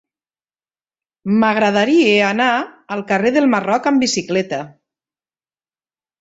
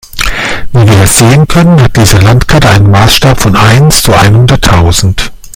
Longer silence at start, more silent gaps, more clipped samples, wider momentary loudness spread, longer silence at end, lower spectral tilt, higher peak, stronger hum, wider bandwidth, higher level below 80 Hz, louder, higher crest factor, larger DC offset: first, 1.25 s vs 0.15 s; neither; second, under 0.1% vs 8%; first, 13 LU vs 7 LU; first, 1.55 s vs 0.05 s; about the same, -4.5 dB/octave vs -4.5 dB/octave; about the same, -2 dBFS vs 0 dBFS; neither; second, 8 kHz vs over 20 kHz; second, -60 dBFS vs -18 dBFS; second, -16 LUFS vs -5 LUFS; first, 16 dB vs 4 dB; neither